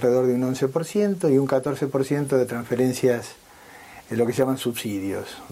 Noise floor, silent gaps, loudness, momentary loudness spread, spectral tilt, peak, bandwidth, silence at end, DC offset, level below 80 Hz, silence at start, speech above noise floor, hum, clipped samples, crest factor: -46 dBFS; none; -23 LUFS; 10 LU; -6 dB/octave; -8 dBFS; 16 kHz; 0 s; under 0.1%; -62 dBFS; 0 s; 23 dB; none; under 0.1%; 16 dB